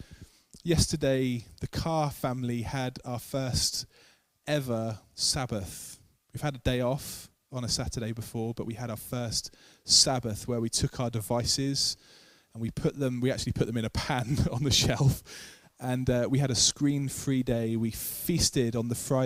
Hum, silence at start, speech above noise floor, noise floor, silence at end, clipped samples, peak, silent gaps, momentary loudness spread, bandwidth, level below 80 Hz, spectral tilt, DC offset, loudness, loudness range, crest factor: none; 0 s; 33 dB; -62 dBFS; 0 s; under 0.1%; -8 dBFS; none; 14 LU; 16 kHz; -48 dBFS; -4 dB/octave; under 0.1%; -29 LUFS; 6 LU; 22 dB